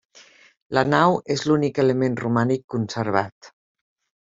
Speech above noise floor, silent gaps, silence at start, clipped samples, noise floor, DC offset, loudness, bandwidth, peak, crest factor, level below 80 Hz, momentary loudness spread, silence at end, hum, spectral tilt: 30 dB; 2.64-2.68 s, 3.32-3.41 s; 0.7 s; under 0.1%; -51 dBFS; under 0.1%; -21 LUFS; 7.8 kHz; -2 dBFS; 20 dB; -60 dBFS; 7 LU; 0.75 s; none; -6.5 dB/octave